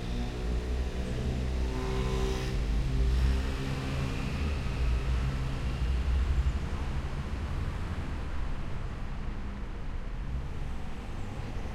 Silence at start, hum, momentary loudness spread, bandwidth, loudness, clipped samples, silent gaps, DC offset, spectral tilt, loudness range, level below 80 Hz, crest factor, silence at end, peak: 0 s; none; 9 LU; 11.5 kHz; -34 LUFS; under 0.1%; none; under 0.1%; -6.5 dB/octave; 7 LU; -32 dBFS; 16 dB; 0 s; -16 dBFS